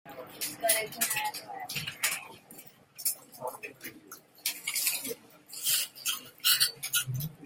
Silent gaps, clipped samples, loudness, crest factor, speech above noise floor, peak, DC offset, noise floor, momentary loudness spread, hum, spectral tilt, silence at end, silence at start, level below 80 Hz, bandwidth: none; under 0.1%; -30 LUFS; 24 dB; 18 dB; -10 dBFS; under 0.1%; -53 dBFS; 20 LU; none; -0.5 dB/octave; 0 s; 0.05 s; -72 dBFS; 17 kHz